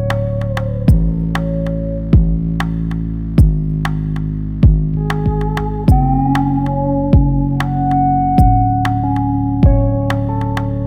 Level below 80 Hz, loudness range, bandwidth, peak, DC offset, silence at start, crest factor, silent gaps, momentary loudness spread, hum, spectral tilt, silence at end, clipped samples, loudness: -20 dBFS; 3 LU; 13.5 kHz; 0 dBFS; under 0.1%; 0 s; 14 dB; none; 7 LU; none; -9 dB/octave; 0 s; under 0.1%; -16 LUFS